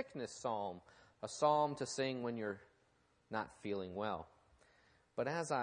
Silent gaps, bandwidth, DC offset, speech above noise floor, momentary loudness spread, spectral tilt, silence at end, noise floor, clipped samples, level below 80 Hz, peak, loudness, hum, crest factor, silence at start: none; 10 kHz; under 0.1%; 35 dB; 15 LU; -4.5 dB/octave; 0 s; -75 dBFS; under 0.1%; -78 dBFS; -20 dBFS; -41 LUFS; none; 22 dB; 0 s